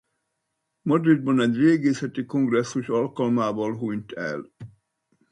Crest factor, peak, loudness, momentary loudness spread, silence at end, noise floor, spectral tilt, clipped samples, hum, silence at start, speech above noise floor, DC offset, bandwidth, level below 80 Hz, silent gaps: 18 dB; -6 dBFS; -23 LUFS; 12 LU; 0.65 s; -78 dBFS; -7 dB/octave; under 0.1%; none; 0.85 s; 56 dB; under 0.1%; 11 kHz; -68 dBFS; none